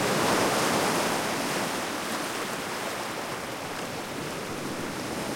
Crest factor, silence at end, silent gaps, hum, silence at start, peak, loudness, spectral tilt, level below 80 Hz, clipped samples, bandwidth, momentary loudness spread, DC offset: 18 dB; 0 s; none; none; 0 s; -12 dBFS; -29 LUFS; -3 dB/octave; -60 dBFS; under 0.1%; 16.5 kHz; 10 LU; under 0.1%